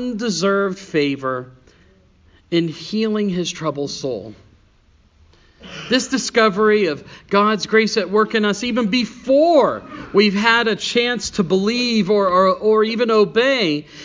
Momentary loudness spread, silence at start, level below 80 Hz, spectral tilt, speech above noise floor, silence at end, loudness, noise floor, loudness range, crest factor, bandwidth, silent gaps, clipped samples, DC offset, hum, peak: 9 LU; 0 s; -54 dBFS; -4.5 dB/octave; 37 dB; 0 s; -17 LUFS; -54 dBFS; 8 LU; 18 dB; 7.6 kHz; none; under 0.1%; under 0.1%; none; 0 dBFS